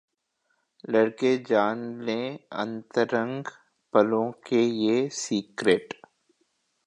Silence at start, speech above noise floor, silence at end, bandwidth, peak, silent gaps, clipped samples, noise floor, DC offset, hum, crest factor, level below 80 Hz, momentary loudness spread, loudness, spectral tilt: 0.9 s; 50 dB; 1 s; 11 kHz; -6 dBFS; none; under 0.1%; -75 dBFS; under 0.1%; none; 22 dB; -74 dBFS; 11 LU; -26 LUFS; -5 dB/octave